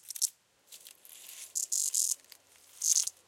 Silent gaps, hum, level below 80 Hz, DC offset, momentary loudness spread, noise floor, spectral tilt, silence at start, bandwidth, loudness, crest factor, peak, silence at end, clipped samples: none; none; under -90 dBFS; under 0.1%; 23 LU; -59 dBFS; 5 dB/octave; 0.05 s; 17 kHz; -30 LUFS; 26 dB; -10 dBFS; 0.15 s; under 0.1%